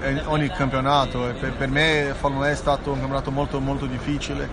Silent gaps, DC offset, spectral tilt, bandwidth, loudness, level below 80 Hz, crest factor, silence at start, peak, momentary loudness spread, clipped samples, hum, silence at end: none; under 0.1%; -5.5 dB/octave; 10 kHz; -23 LUFS; -34 dBFS; 16 dB; 0 s; -6 dBFS; 7 LU; under 0.1%; none; 0 s